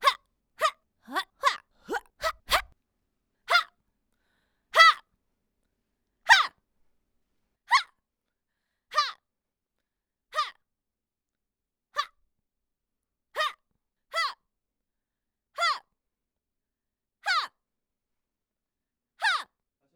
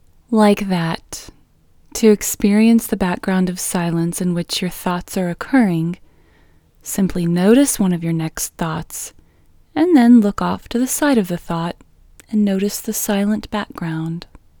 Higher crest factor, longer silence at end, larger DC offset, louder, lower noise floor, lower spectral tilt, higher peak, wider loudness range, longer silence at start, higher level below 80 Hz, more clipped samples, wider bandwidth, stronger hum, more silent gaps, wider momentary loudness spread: first, 26 dB vs 18 dB; first, 0.5 s vs 0.35 s; neither; second, -26 LUFS vs -17 LUFS; first, -88 dBFS vs -52 dBFS; second, 0.5 dB/octave vs -5.5 dB/octave; second, -6 dBFS vs 0 dBFS; first, 13 LU vs 4 LU; second, 0 s vs 0.3 s; second, -62 dBFS vs -44 dBFS; neither; about the same, over 20 kHz vs over 20 kHz; neither; neither; about the same, 17 LU vs 15 LU